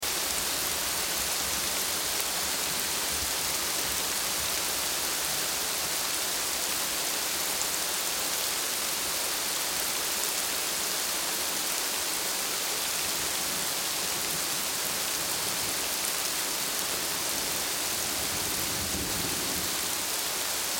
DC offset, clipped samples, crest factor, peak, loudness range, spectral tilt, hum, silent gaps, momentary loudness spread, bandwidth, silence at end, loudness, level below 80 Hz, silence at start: under 0.1%; under 0.1%; 22 dB; -8 dBFS; 1 LU; 0 dB/octave; none; none; 1 LU; 17 kHz; 0 s; -27 LUFS; -54 dBFS; 0 s